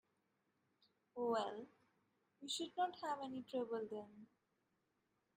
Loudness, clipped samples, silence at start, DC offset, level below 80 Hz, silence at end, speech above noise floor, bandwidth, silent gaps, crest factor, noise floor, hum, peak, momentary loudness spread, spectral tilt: -44 LUFS; under 0.1%; 1.15 s; under 0.1%; under -90 dBFS; 1.1 s; 41 dB; 15 kHz; none; 20 dB; -85 dBFS; none; -28 dBFS; 17 LU; -3 dB/octave